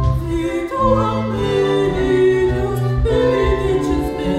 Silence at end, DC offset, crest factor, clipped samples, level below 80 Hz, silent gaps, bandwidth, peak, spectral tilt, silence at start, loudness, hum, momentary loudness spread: 0 s; under 0.1%; 14 dB; under 0.1%; -26 dBFS; none; 14 kHz; -2 dBFS; -7.5 dB/octave; 0 s; -17 LUFS; none; 5 LU